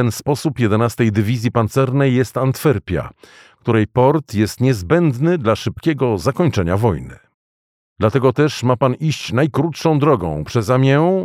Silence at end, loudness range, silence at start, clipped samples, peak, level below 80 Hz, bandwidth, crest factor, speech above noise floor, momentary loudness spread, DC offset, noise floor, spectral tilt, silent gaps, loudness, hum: 0 s; 2 LU; 0 s; under 0.1%; -2 dBFS; -44 dBFS; 15.5 kHz; 14 dB; over 74 dB; 6 LU; under 0.1%; under -90 dBFS; -7 dB/octave; 7.34-7.96 s; -17 LUFS; none